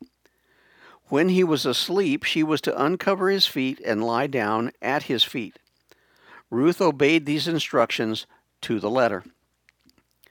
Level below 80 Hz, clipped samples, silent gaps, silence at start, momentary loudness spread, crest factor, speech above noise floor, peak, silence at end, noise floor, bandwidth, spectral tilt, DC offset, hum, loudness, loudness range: -70 dBFS; under 0.1%; none; 0 s; 8 LU; 20 dB; 43 dB; -4 dBFS; 1 s; -65 dBFS; 19.5 kHz; -5 dB/octave; under 0.1%; none; -23 LUFS; 3 LU